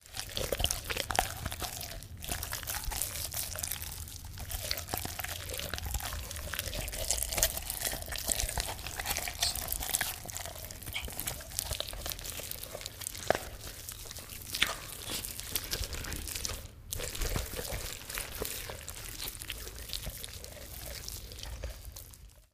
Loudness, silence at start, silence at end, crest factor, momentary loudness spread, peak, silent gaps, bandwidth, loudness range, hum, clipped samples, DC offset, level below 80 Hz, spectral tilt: -36 LUFS; 0 s; 0.1 s; 34 dB; 11 LU; -4 dBFS; none; 15.5 kHz; 6 LU; none; under 0.1%; under 0.1%; -46 dBFS; -1.5 dB/octave